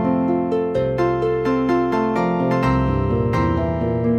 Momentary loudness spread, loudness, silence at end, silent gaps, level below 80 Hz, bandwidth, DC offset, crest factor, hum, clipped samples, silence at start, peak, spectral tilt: 2 LU; -19 LUFS; 0 s; none; -34 dBFS; 8.4 kHz; under 0.1%; 12 dB; none; under 0.1%; 0 s; -6 dBFS; -9 dB/octave